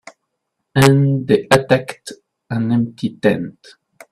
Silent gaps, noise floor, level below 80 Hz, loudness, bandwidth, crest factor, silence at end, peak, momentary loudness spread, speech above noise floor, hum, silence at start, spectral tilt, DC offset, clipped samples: none; -75 dBFS; -50 dBFS; -16 LUFS; 15 kHz; 18 dB; 0.6 s; 0 dBFS; 18 LU; 59 dB; none; 0.75 s; -6.5 dB/octave; under 0.1%; under 0.1%